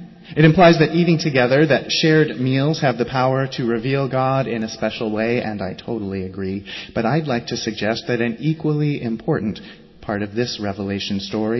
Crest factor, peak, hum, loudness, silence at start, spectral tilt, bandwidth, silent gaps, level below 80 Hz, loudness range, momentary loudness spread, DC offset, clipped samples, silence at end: 16 dB; -2 dBFS; none; -19 LUFS; 0 s; -6.5 dB/octave; 6.2 kHz; none; -48 dBFS; 7 LU; 12 LU; under 0.1%; under 0.1%; 0 s